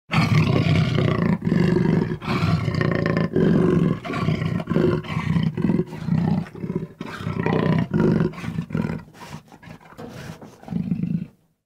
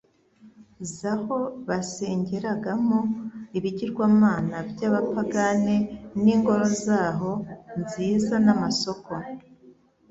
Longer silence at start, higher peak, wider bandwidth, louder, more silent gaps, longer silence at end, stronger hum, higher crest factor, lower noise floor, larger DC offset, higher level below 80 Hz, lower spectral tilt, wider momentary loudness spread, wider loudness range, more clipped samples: second, 0.1 s vs 0.45 s; about the same, -6 dBFS vs -6 dBFS; first, 9.6 kHz vs 8 kHz; first, -22 LUFS vs -25 LUFS; neither; about the same, 0.4 s vs 0.4 s; neither; about the same, 16 dB vs 20 dB; second, -44 dBFS vs -55 dBFS; neither; first, -46 dBFS vs -58 dBFS; first, -8 dB/octave vs -6 dB/octave; first, 18 LU vs 13 LU; about the same, 6 LU vs 5 LU; neither